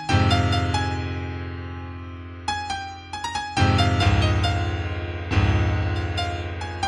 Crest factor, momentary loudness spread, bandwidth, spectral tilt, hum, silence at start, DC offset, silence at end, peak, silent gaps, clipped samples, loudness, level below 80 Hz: 16 dB; 14 LU; 11 kHz; -5.5 dB/octave; none; 0 s; under 0.1%; 0 s; -8 dBFS; none; under 0.1%; -24 LUFS; -34 dBFS